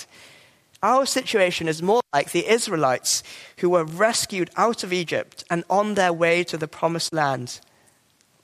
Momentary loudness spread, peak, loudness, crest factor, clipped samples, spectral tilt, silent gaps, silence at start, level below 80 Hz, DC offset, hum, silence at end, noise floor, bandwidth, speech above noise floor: 8 LU; -4 dBFS; -22 LUFS; 20 dB; under 0.1%; -3.5 dB/octave; none; 0 s; -68 dBFS; under 0.1%; none; 0.85 s; -62 dBFS; 15.5 kHz; 39 dB